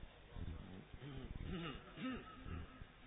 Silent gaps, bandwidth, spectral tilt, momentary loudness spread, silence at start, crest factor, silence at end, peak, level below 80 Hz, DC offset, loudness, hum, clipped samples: none; 3.9 kHz; -5.5 dB/octave; 8 LU; 0 s; 16 dB; 0 s; -34 dBFS; -56 dBFS; under 0.1%; -51 LUFS; none; under 0.1%